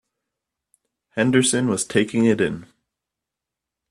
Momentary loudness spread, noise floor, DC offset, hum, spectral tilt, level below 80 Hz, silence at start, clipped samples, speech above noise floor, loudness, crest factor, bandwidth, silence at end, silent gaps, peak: 10 LU; -85 dBFS; under 0.1%; none; -4.5 dB/octave; -60 dBFS; 1.15 s; under 0.1%; 66 dB; -20 LUFS; 20 dB; 12.5 kHz; 1.25 s; none; -4 dBFS